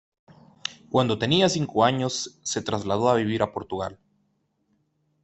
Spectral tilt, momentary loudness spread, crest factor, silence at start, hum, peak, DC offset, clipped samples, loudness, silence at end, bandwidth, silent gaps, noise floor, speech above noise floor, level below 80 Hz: -4.5 dB/octave; 13 LU; 20 dB; 0.65 s; none; -6 dBFS; under 0.1%; under 0.1%; -24 LUFS; 1.3 s; 8.4 kHz; none; -71 dBFS; 47 dB; -62 dBFS